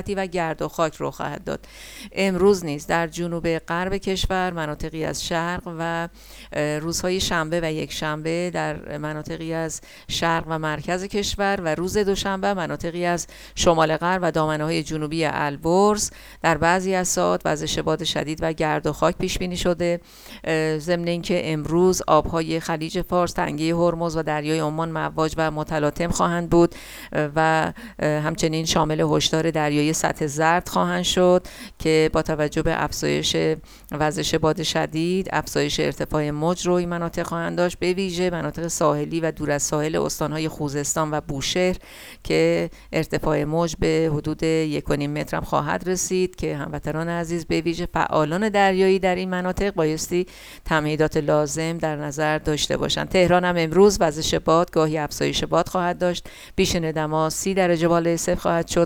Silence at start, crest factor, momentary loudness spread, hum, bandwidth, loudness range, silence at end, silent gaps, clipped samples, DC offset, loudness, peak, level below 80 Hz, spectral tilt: 0 s; 18 dB; 8 LU; none; 18.5 kHz; 5 LU; 0 s; none; under 0.1%; under 0.1%; -22 LUFS; -4 dBFS; -42 dBFS; -4.5 dB/octave